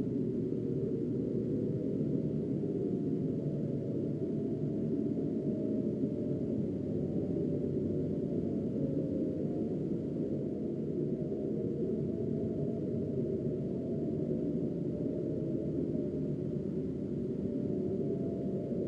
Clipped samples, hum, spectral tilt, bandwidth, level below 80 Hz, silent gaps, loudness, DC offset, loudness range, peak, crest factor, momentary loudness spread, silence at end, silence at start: under 0.1%; none; -11.5 dB/octave; 7.4 kHz; -58 dBFS; none; -35 LUFS; under 0.1%; 1 LU; -20 dBFS; 14 dB; 2 LU; 0 s; 0 s